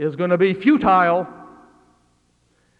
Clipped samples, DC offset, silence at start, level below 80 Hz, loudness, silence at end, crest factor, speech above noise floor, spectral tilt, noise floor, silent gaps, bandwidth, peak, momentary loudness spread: under 0.1%; under 0.1%; 0 s; -54 dBFS; -17 LUFS; 1.35 s; 16 dB; 45 dB; -8.5 dB/octave; -62 dBFS; none; 5.2 kHz; -4 dBFS; 8 LU